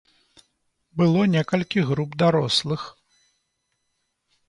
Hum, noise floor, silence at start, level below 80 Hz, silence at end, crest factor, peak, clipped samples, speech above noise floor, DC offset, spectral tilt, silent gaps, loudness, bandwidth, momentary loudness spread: none; -75 dBFS; 0.95 s; -60 dBFS; 1.6 s; 18 dB; -6 dBFS; under 0.1%; 54 dB; under 0.1%; -6 dB/octave; none; -22 LUFS; 11 kHz; 12 LU